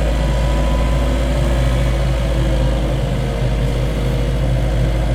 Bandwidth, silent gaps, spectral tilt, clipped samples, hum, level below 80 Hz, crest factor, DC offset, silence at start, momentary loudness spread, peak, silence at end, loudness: 11.5 kHz; none; -6.5 dB/octave; under 0.1%; none; -18 dBFS; 10 dB; under 0.1%; 0 s; 2 LU; -4 dBFS; 0 s; -18 LUFS